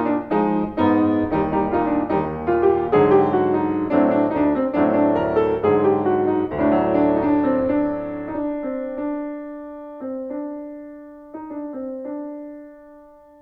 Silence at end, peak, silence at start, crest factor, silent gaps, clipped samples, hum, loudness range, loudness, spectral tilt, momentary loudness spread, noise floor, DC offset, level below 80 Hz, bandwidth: 0.4 s; -4 dBFS; 0 s; 16 dB; none; under 0.1%; none; 14 LU; -20 LUFS; -10 dB/octave; 16 LU; -46 dBFS; under 0.1%; -48 dBFS; 4.7 kHz